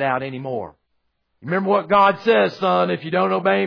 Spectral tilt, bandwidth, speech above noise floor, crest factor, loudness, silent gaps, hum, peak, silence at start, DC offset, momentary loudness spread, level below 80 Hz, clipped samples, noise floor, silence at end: -7.5 dB/octave; 5.4 kHz; 52 dB; 16 dB; -19 LUFS; none; none; -4 dBFS; 0 s; under 0.1%; 13 LU; -62 dBFS; under 0.1%; -71 dBFS; 0 s